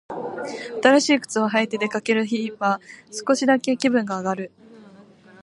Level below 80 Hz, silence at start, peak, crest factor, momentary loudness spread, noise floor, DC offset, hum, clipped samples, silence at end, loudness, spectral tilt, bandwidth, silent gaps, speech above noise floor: -72 dBFS; 0.1 s; -2 dBFS; 22 dB; 13 LU; -48 dBFS; under 0.1%; none; under 0.1%; 0.55 s; -22 LUFS; -4 dB/octave; 11.5 kHz; none; 27 dB